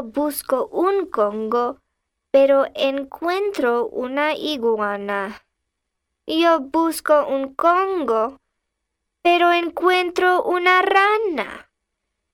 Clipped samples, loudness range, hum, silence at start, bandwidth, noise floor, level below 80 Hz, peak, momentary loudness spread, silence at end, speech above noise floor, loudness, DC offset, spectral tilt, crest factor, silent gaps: under 0.1%; 4 LU; none; 0 s; 17 kHz; -78 dBFS; -60 dBFS; -4 dBFS; 9 LU; 0.75 s; 59 dB; -19 LUFS; under 0.1%; -3.5 dB/octave; 18 dB; none